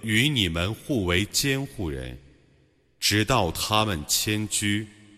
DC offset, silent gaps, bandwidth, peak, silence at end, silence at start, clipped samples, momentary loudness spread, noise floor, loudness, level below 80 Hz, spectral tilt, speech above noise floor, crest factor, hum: under 0.1%; none; 15.5 kHz; -8 dBFS; 0.25 s; 0 s; under 0.1%; 10 LU; -62 dBFS; -24 LUFS; -44 dBFS; -3.5 dB/octave; 37 dB; 18 dB; none